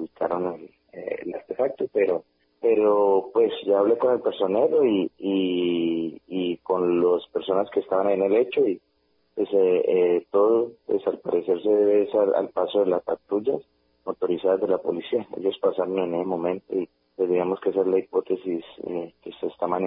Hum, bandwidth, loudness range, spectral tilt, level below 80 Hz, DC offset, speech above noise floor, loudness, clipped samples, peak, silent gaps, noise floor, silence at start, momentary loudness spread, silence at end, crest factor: none; 4 kHz; 4 LU; -10.5 dB/octave; -68 dBFS; under 0.1%; 45 dB; -24 LUFS; under 0.1%; -8 dBFS; none; -68 dBFS; 0 s; 12 LU; 0 s; 14 dB